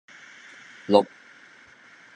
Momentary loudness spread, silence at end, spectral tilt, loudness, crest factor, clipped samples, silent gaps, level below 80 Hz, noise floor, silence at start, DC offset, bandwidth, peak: 24 LU; 1.1 s; -6 dB/octave; -23 LUFS; 26 dB; under 0.1%; none; -82 dBFS; -52 dBFS; 0.9 s; under 0.1%; 9.6 kHz; -2 dBFS